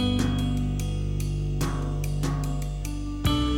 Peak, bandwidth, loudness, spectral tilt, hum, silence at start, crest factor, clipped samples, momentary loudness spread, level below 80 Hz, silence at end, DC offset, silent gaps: -10 dBFS; 17.5 kHz; -28 LUFS; -6 dB/octave; 50 Hz at -35 dBFS; 0 s; 14 dB; under 0.1%; 6 LU; -30 dBFS; 0 s; under 0.1%; none